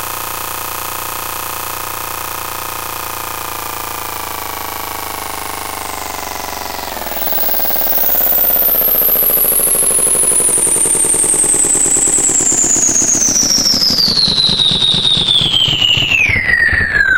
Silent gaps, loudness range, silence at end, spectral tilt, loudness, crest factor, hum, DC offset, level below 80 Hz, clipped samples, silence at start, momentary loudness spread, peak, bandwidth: none; 12 LU; 0 s; 0 dB/octave; -11 LUFS; 14 dB; none; 1%; -36 dBFS; under 0.1%; 0 s; 12 LU; 0 dBFS; 17 kHz